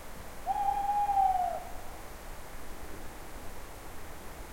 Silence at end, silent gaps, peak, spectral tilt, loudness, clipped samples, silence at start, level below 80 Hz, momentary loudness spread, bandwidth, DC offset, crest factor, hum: 0 s; none; -18 dBFS; -4 dB/octave; -31 LUFS; under 0.1%; 0 s; -46 dBFS; 19 LU; 16.5 kHz; under 0.1%; 16 dB; none